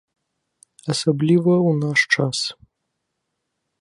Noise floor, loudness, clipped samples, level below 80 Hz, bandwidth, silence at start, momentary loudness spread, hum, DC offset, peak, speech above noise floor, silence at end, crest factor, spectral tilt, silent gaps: -77 dBFS; -19 LUFS; under 0.1%; -64 dBFS; 11.5 kHz; 0.85 s; 9 LU; none; under 0.1%; -4 dBFS; 59 dB; 1.3 s; 18 dB; -5 dB/octave; none